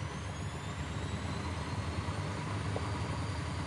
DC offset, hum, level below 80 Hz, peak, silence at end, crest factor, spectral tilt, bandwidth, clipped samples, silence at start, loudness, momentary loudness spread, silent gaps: under 0.1%; none; -50 dBFS; -24 dBFS; 0 s; 14 dB; -5.5 dB/octave; 11.5 kHz; under 0.1%; 0 s; -38 LUFS; 4 LU; none